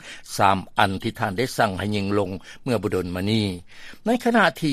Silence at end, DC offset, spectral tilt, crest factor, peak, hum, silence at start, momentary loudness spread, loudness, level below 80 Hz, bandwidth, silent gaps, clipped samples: 0 s; under 0.1%; -5.5 dB/octave; 22 dB; 0 dBFS; none; 0 s; 11 LU; -23 LUFS; -52 dBFS; 15 kHz; none; under 0.1%